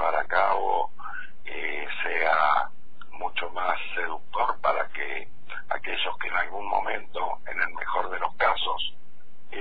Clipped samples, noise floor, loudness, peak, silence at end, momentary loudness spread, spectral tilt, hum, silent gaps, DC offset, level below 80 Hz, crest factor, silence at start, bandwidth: under 0.1%; -57 dBFS; -27 LUFS; -8 dBFS; 0 s; 12 LU; -6 dB/octave; none; none; 4%; -56 dBFS; 20 dB; 0 s; 5 kHz